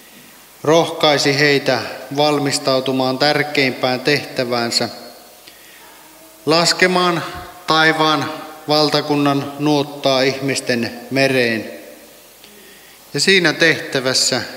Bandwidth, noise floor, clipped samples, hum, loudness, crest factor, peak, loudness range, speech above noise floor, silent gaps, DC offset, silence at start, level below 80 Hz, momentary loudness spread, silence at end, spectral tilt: 16 kHz; -43 dBFS; under 0.1%; none; -16 LUFS; 18 dB; 0 dBFS; 3 LU; 26 dB; none; under 0.1%; 0.15 s; -58 dBFS; 11 LU; 0 s; -3.5 dB/octave